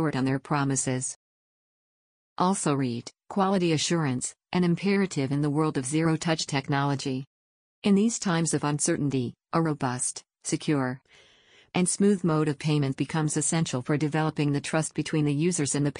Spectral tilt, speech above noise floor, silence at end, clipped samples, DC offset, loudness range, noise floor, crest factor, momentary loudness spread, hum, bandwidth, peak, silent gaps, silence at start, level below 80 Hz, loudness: -5 dB/octave; over 64 dB; 0 s; under 0.1%; under 0.1%; 3 LU; under -90 dBFS; 16 dB; 7 LU; none; 10 kHz; -12 dBFS; 1.16-2.36 s, 7.27-7.82 s; 0 s; -62 dBFS; -27 LUFS